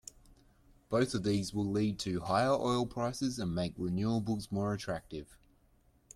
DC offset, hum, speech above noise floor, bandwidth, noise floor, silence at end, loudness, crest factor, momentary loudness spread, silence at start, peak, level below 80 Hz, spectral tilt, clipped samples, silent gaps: under 0.1%; none; 34 dB; 14 kHz; -68 dBFS; 0.8 s; -34 LUFS; 18 dB; 8 LU; 0.9 s; -16 dBFS; -58 dBFS; -6 dB/octave; under 0.1%; none